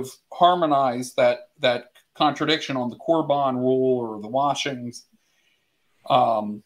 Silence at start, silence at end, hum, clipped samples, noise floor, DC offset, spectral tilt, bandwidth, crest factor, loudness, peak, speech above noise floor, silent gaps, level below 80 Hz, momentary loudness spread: 0 s; 0.05 s; none; under 0.1%; -69 dBFS; under 0.1%; -5 dB/octave; 15.5 kHz; 20 dB; -22 LUFS; -4 dBFS; 47 dB; none; -72 dBFS; 8 LU